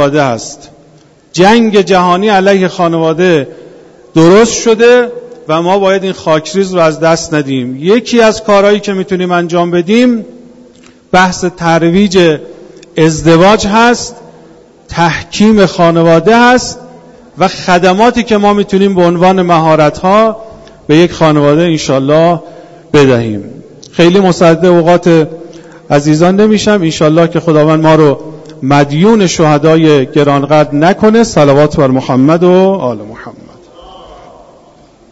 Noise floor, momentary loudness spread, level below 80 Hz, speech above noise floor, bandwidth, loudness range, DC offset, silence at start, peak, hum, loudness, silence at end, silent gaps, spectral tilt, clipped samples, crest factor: -42 dBFS; 9 LU; -40 dBFS; 34 dB; 9 kHz; 3 LU; under 0.1%; 0 s; 0 dBFS; none; -8 LUFS; 1 s; none; -5.5 dB/octave; 1%; 8 dB